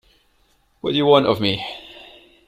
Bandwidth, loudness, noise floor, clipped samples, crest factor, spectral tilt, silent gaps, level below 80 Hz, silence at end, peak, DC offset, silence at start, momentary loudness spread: 14.5 kHz; -18 LUFS; -61 dBFS; under 0.1%; 20 dB; -6.5 dB/octave; none; -56 dBFS; 0.45 s; -2 dBFS; under 0.1%; 0.85 s; 20 LU